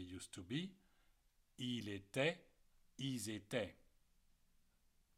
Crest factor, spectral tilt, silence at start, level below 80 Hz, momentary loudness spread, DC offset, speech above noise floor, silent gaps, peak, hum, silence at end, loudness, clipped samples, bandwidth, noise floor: 24 dB; -4.5 dB/octave; 0 s; -76 dBFS; 13 LU; under 0.1%; 31 dB; none; -24 dBFS; none; 1.45 s; -45 LUFS; under 0.1%; 16 kHz; -76 dBFS